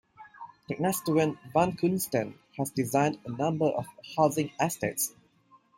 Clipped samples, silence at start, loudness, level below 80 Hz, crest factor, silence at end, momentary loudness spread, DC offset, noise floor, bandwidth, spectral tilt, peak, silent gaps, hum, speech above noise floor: under 0.1%; 0.2 s; -29 LUFS; -66 dBFS; 20 dB; 0.7 s; 10 LU; under 0.1%; -62 dBFS; 16.5 kHz; -5.5 dB/octave; -10 dBFS; none; none; 34 dB